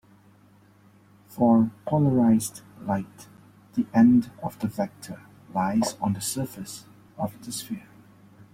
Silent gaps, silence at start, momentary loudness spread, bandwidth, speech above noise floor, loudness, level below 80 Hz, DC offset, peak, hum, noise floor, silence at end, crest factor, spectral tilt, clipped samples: none; 1.3 s; 19 LU; 16 kHz; 32 dB; -25 LUFS; -60 dBFS; under 0.1%; -8 dBFS; none; -56 dBFS; 0.75 s; 18 dB; -6 dB/octave; under 0.1%